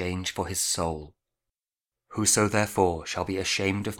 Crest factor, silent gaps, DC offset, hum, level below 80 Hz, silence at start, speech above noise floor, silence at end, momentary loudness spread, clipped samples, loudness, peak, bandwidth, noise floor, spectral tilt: 20 dB; none; under 0.1%; none; -52 dBFS; 0 s; over 63 dB; 0 s; 9 LU; under 0.1%; -26 LUFS; -8 dBFS; 19 kHz; under -90 dBFS; -3 dB/octave